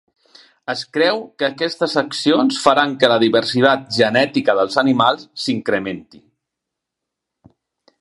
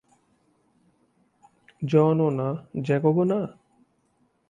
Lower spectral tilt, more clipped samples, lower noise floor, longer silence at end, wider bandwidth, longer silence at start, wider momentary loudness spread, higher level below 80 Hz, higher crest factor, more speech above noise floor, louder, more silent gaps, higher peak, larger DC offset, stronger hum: second, -4.5 dB/octave vs -9.5 dB/octave; neither; first, -81 dBFS vs -68 dBFS; first, 2 s vs 1 s; first, 11.5 kHz vs 7.4 kHz; second, 0.7 s vs 1.8 s; about the same, 9 LU vs 11 LU; about the same, -62 dBFS vs -66 dBFS; about the same, 18 dB vs 20 dB; first, 65 dB vs 45 dB; first, -17 LUFS vs -24 LUFS; neither; first, 0 dBFS vs -8 dBFS; neither; neither